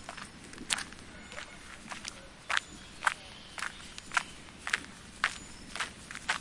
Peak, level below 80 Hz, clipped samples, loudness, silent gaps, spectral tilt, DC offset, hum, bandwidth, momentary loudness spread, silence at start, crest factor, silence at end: -4 dBFS; -58 dBFS; under 0.1%; -37 LUFS; none; -1 dB/octave; under 0.1%; none; 11.5 kHz; 13 LU; 0 s; 34 dB; 0 s